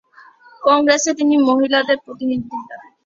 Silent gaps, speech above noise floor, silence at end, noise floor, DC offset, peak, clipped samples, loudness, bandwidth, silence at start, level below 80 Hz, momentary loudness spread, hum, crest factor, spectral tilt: none; 30 dB; 0.25 s; -46 dBFS; under 0.1%; 0 dBFS; under 0.1%; -16 LUFS; 7.8 kHz; 0.6 s; -62 dBFS; 15 LU; none; 16 dB; -2.5 dB/octave